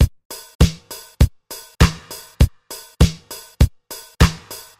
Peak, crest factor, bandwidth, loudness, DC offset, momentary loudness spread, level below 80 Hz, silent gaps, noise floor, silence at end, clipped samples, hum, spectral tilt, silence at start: -2 dBFS; 16 dB; 16 kHz; -19 LUFS; under 0.1%; 17 LU; -22 dBFS; 0.25-0.30 s, 0.55-0.59 s; -39 dBFS; 0.25 s; under 0.1%; none; -5.5 dB/octave; 0 s